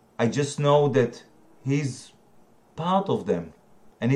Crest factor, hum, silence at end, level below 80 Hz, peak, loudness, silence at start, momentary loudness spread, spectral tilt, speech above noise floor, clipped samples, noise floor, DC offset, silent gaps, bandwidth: 18 dB; none; 0 s; -64 dBFS; -8 dBFS; -25 LUFS; 0.2 s; 16 LU; -6.5 dB/octave; 34 dB; under 0.1%; -58 dBFS; under 0.1%; none; 11 kHz